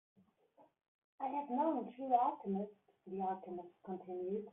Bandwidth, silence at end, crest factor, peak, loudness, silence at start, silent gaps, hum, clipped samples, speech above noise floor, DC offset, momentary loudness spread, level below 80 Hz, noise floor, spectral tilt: 3.8 kHz; 0 s; 20 dB; -20 dBFS; -40 LUFS; 0.6 s; 0.88-1.18 s; none; under 0.1%; 31 dB; under 0.1%; 15 LU; -86 dBFS; -70 dBFS; -5 dB/octave